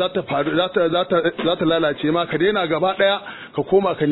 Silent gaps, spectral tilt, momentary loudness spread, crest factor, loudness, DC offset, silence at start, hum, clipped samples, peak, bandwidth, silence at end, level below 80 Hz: none; -8.5 dB/octave; 4 LU; 14 dB; -19 LUFS; under 0.1%; 0 s; none; under 0.1%; -4 dBFS; 4.1 kHz; 0 s; -54 dBFS